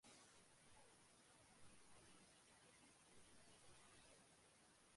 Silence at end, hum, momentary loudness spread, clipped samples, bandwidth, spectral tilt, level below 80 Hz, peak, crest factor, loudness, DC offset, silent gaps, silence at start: 0 s; none; 2 LU; under 0.1%; 11.5 kHz; -2.5 dB/octave; -86 dBFS; -54 dBFS; 14 dB; -69 LUFS; under 0.1%; none; 0 s